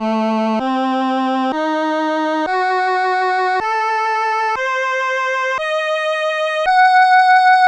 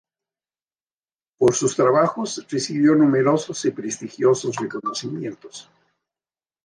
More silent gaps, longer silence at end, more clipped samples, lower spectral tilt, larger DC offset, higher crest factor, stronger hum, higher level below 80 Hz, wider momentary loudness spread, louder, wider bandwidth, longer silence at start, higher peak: neither; second, 0 s vs 1.05 s; neither; about the same, -4 dB/octave vs -5 dB/octave; neither; about the same, 12 dB vs 16 dB; first, 50 Hz at -75 dBFS vs none; first, -58 dBFS vs -64 dBFS; second, 8 LU vs 14 LU; first, -16 LUFS vs -21 LUFS; second, 9.4 kHz vs 10.5 kHz; second, 0 s vs 1.4 s; first, -2 dBFS vs -6 dBFS